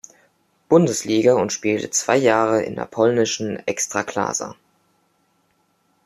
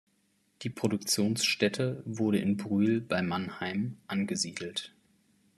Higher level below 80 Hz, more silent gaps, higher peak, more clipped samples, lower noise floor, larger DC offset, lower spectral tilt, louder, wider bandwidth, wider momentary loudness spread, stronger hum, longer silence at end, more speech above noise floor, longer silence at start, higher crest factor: first, -64 dBFS vs -72 dBFS; neither; first, -2 dBFS vs -12 dBFS; neither; second, -65 dBFS vs -72 dBFS; neither; about the same, -4 dB/octave vs -4.5 dB/octave; first, -19 LUFS vs -30 LUFS; about the same, 14 kHz vs 13.5 kHz; about the same, 8 LU vs 10 LU; neither; first, 1.55 s vs 0.7 s; first, 46 dB vs 41 dB; about the same, 0.7 s vs 0.6 s; about the same, 18 dB vs 20 dB